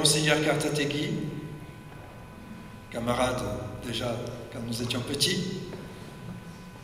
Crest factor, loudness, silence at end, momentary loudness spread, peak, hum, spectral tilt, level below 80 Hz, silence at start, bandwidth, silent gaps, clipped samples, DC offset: 24 dB; -29 LUFS; 0 s; 20 LU; -6 dBFS; none; -3.5 dB/octave; -52 dBFS; 0 s; 16 kHz; none; under 0.1%; under 0.1%